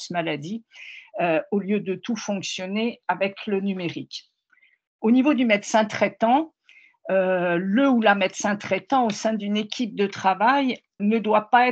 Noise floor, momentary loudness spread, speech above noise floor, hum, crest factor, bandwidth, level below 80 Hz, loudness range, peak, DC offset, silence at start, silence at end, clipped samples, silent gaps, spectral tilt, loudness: -62 dBFS; 12 LU; 40 dB; none; 18 dB; 8.4 kHz; -74 dBFS; 5 LU; -4 dBFS; under 0.1%; 0 s; 0 s; under 0.1%; 4.87-4.99 s; -5 dB/octave; -23 LUFS